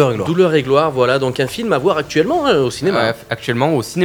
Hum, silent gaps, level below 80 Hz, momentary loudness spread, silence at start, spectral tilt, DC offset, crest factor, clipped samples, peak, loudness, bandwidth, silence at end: none; none; -48 dBFS; 5 LU; 0 s; -5.5 dB/octave; under 0.1%; 16 dB; under 0.1%; 0 dBFS; -16 LUFS; over 20 kHz; 0 s